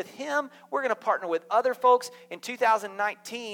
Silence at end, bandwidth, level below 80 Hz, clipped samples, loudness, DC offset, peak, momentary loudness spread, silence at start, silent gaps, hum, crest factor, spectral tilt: 0 s; 17.5 kHz; -88 dBFS; under 0.1%; -27 LUFS; under 0.1%; -10 dBFS; 13 LU; 0 s; none; none; 18 dB; -2.5 dB/octave